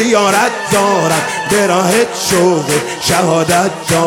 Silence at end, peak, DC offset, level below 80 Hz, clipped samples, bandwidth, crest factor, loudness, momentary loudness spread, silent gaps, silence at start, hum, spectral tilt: 0 s; 0 dBFS; under 0.1%; -48 dBFS; under 0.1%; 19 kHz; 12 dB; -12 LUFS; 3 LU; none; 0 s; none; -3.5 dB/octave